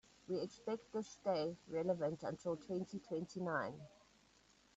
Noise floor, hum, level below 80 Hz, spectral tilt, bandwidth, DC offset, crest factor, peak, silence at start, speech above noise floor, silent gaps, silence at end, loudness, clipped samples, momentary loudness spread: -71 dBFS; none; -78 dBFS; -6 dB/octave; 8.2 kHz; under 0.1%; 18 dB; -26 dBFS; 0.3 s; 29 dB; none; 0.9 s; -43 LUFS; under 0.1%; 6 LU